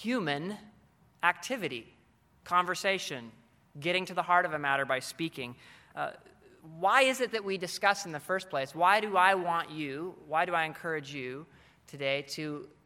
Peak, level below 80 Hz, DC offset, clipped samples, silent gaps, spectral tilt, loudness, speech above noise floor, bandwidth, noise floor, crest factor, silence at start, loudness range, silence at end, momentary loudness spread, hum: -8 dBFS; -74 dBFS; under 0.1%; under 0.1%; none; -3.5 dB/octave; -30 LUFS; 34 dB; 16.5 kHz; -65 dBFS; 24 dB; 0 s; 5 LU; 0.2 s; 15 LU; none